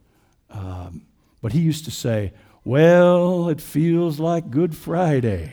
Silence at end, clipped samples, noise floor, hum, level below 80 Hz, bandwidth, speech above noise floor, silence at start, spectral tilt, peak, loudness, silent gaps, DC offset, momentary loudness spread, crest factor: 0 s; under 0.1%; -60 dBFS; none; -48 dBFS; over 20 kHz; 41 dB; 0.55 s; -7.5 dB/octave; -4 dBFS; -19 LUFS; none; under 0.1%; 20 LU; 16 dB